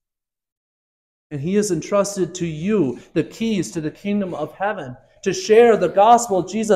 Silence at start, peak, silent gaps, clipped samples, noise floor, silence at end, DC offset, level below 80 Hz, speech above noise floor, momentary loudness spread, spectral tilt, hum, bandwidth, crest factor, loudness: 1.3 s; -2 dBFS; none; under 0.1%; -87 dBFS; 0 s; under 0.1%; -56 dBFS; 69 dB; 13 LU; -5 dB/octave; none; 14 kHz; 18 dB; -19 LUFS